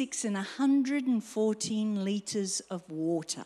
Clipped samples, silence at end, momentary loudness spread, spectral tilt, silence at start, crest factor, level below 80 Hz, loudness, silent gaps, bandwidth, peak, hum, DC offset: under 0.1%; 0 s; 6 LU; -4.5 dB/octave; 0 s; 12 dB; -78 dBFS; -31 LUFS; none; 13 kHz; -18 dBFS; none; under 0.1%